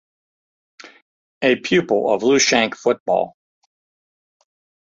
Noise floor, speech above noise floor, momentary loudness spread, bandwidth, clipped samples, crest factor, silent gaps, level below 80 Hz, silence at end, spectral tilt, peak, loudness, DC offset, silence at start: under -90 dBFS; over 73 dB; 7 LU; 7.8 kHz; under 0.1%; 18 dB; 3.00-3.06 s; -62 dBFS; 1.6 s; -3 dB/octave; -2 dBFS; -18 LUFS; under 0.1%; 1.4 s